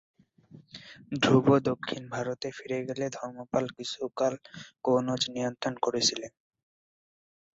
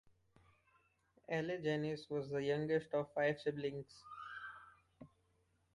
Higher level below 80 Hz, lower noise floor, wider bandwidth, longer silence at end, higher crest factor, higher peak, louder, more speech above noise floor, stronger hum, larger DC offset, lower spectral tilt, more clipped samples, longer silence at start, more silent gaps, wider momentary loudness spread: first, -68 dBFS vs -76 dBFS; second, -55 dBFS vs -78 dBFS; second, 8 kHz vs 11.5 kHz; first, 1.25 s vs 0.7 s; about the same, 22 dB vs 18 dB; first, -8 dBFS vs -24 dBFS; first, -29 LUFS vs -40 LUFS; second, 26 dB vs 38 dB; neither; neither; second, -4.5 dB/octave vs -7 dB/octave; neither; second, 0.55 s vs 1.3 s; neither; first, 19 LU vs 15 LU